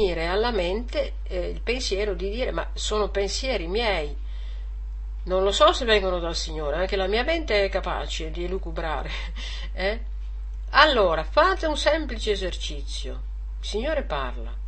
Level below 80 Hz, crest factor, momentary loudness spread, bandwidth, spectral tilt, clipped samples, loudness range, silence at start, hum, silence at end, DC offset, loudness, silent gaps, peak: -32 dBFS; 24 dB; 16 LU; 8.8 kHz; -4 dB/octave; under 0.1%; 5 LU; 0 s; none; 0 s; 0.3%; -25 LUFS; none; -2 dBFS